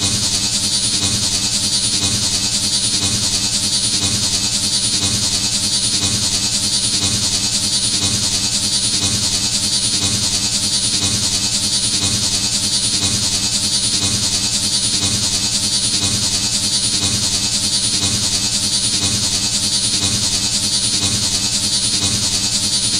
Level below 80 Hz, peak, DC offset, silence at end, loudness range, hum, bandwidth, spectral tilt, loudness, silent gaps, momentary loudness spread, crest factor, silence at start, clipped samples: -38 dBFS; -2 dBFS; 0.1%; 0 s; 0 LU; none; 16 kHz; -1 dB/octave; -14 LUFS; none; 1 LU; 16 dB; 0 s; under 0.1%